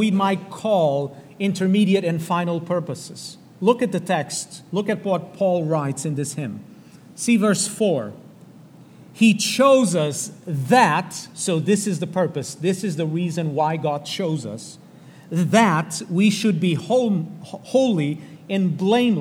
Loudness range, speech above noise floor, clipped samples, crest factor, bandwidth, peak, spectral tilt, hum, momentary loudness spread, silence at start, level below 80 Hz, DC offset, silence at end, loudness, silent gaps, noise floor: 5 LU; 25 dB; under 0.1%; 20 dB; 16.5 kHz; -2 dBFS; -5 dB/octave; none; 12 LU; 0 s; -72 dBFS; under 0.1%; 0 s; -21 LUFS; none; -45 dBFS